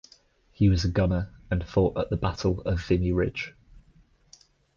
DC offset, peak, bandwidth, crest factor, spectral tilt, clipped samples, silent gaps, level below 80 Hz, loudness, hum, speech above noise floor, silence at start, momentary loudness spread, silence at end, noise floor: under 0.1%; -12 dBFS; 7.2 kHz; 16 dB; -7.5 dB/octave; under 0.1%; none; -38 dBFS; -26 LUFS; none; 35 dB; 0.6 s; 8 LU; 1.3 s; -60 dBFS